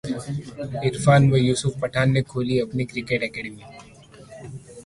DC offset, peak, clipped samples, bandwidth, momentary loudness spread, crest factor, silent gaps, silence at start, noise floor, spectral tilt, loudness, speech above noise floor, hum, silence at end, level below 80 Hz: under 0.1%; -4 dBFS; under 0.1%; 11.5 kHz; 23 LU; 20 dB; none; 0.05 s; -46 dBFS; -6 dB/octave; -22 LUFS; 24 dB; none; 0.05 s; -50 dBFS